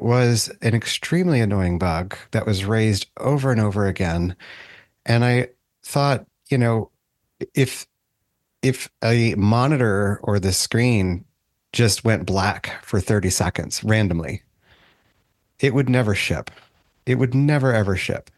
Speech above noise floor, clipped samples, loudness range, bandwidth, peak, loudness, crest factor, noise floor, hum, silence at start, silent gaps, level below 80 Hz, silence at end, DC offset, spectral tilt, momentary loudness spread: 55 dB; under 0.1%; 4 LU; 12.5 kHz; -2 dBFS; -21 LUFS; 18 dB; -74 dBFS; none; 0 s; none; -46 dBFS; 0.15 s; under 0.1%; -5.5 dB/octave; 10 LU